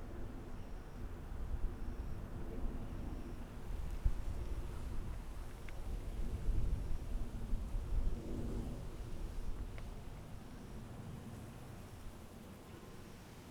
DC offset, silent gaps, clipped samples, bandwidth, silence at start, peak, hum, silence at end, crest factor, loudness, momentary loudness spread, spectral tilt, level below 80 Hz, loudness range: under 0.1%; none; under 0.1%; 15 kHz; 0 s; -22 dBFS; none; 0 s; 18 dB; -47 LUFS; 11 LU; -7 dB/octave; -42 dBFS; 7 LU